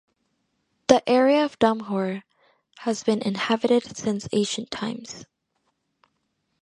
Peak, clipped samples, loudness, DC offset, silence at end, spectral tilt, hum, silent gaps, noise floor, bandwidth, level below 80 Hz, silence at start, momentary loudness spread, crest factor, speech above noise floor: 0 dBFS; under 0.1%; -23 LUFS; under 0.1%; 1.35 s; -4.5 dB/octave; none; none; -74 dBFS; 11 kHz; -64 dBFS; 0.9 s; 13 LU; 24 dB; 51 dB